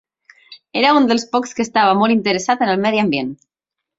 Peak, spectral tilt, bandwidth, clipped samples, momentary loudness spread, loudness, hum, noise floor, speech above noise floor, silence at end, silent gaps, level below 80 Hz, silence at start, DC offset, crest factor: -2 dBFS; -4.5 dB/octave; 7.8 kHz; under 0.1%; 8 LU; -16 LUFS; none; -46 dBFS; 30 dB; 0.65 s; none; -62 dBFS; 0.5 s; under 0.1%; 16 dB